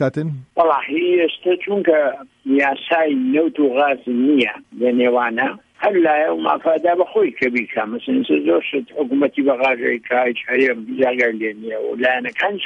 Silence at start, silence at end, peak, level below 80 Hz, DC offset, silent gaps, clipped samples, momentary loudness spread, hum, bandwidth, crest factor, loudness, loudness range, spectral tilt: 0 s; 0 s; -4 dBFS; -66 dBFS; under 0.1%; none; under 0.1%; 6 LU; none; 7 kHz; 14 dB; -18 LUFS; 1 LU; -7 dB/octave